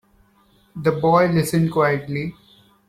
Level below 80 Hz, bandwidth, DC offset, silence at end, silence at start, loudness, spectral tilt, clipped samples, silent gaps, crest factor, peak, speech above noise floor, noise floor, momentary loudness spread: -54 dBFS; 15 kHz; under 0.1%; 0.55 s; 0.75 s; -19 LUFS; -6.5 dB/octave; under 0.1%; none; 18 dB; -4 dBFS; 39 dB; -57 dBFS; 12 LU